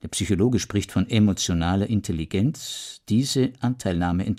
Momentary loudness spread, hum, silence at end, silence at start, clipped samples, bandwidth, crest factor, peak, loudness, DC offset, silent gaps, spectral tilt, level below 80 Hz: 6 LU; none; 0 s; 0.05 s; under 0.1%; 15.5 kHz; 16 dB; -8 dBFS; -24 LUFS; under 0.1%; none; -5.5 dB/octave; -44 dBFS